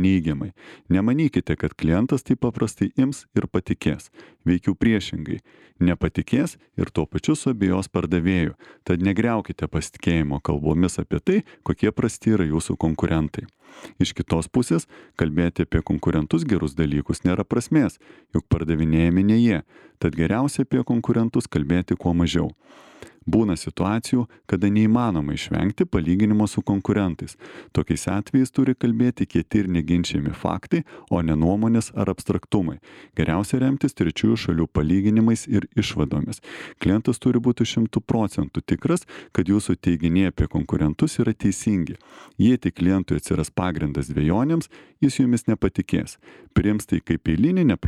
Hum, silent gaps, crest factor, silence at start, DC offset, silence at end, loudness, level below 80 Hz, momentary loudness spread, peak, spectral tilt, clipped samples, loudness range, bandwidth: none; none; 18 dB; 0 s; under 0.1%; 0 s; -22 LUFS; -40 dBFS; 7 LU; -4 dBFS; -7 dB/octave; under 0.1%; 2 LU; 13 kHz